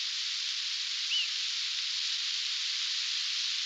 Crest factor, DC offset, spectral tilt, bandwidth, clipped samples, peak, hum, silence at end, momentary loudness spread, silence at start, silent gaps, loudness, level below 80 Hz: 14 dB; under 0.1%; 10 dB/octave; 16 kHz; under 0.1%; -18 dBFS; none; 0 s; 2 LU; 0 s; none; -30 LUFS; under -90 dBFS